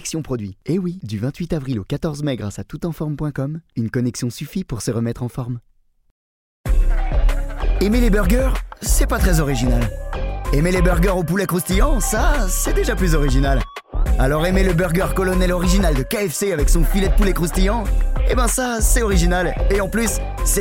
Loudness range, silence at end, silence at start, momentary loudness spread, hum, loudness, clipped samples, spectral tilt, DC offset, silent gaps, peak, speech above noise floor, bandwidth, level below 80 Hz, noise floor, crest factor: 6 LU; 0 s; 0 s; 9 LU; none; -20 LUFS; under 0.1%; -5 dB/octave; under 0.1%; 6.11-6.64 s; -2 dBFS; over 73 dB; 17 kHz; -20 dBFS; under -90 dBFS; 16 dB